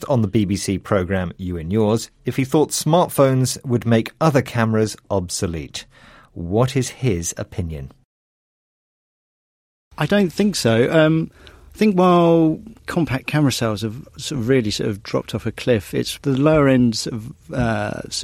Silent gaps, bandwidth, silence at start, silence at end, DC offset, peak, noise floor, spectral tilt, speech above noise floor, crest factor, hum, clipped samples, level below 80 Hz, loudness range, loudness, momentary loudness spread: 8.05-9.91 s; 16 kHz; 0 s; 0 s; under 0.1%; -2 dBFS; under -90 dBFS; -5.5 dB/octave; over 71 dB; 16 dB; none; under 0.1%; -44 dBFS; 8 LU; -19 LUFS; 13 LU